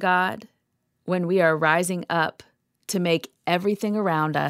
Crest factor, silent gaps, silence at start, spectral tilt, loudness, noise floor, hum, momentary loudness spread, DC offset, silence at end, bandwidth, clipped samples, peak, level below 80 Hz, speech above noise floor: 20 dB; none; 0 s; -5 dB/octave; -23 LUFS; -74 dBFS; none; 9 LU; under 0.1%; 0 s; 16 kHz; under 0.1%; -4 dBFS; -72 dBFS; 51 dB